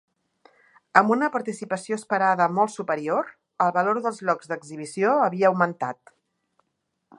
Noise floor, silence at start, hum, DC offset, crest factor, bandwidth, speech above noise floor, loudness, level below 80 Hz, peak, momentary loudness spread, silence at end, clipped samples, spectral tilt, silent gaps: -77 dBFS; 0.95 s; none; under 0.1%; 24 dB; 11.5 kHz; 54 dB; -23 LUFS; -78 dBFS; 0 dBFS; 12 LU; 1.25 s; under 0.1%; -6 dB/octave; none